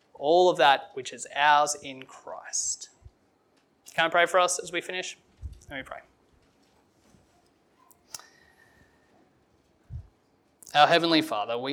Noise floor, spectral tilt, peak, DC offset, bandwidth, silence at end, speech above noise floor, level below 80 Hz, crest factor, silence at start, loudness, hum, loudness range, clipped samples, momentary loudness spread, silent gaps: -67 dBFS; -2.5 dB/octave; -4 dBFS; under 0.1%; 17 kHz; 0 s; 42 dB; -58 dBFS; 24 dB; 0.2 s; -24 LUFS; none; 24 LU; under 0.1%; 25 LU; none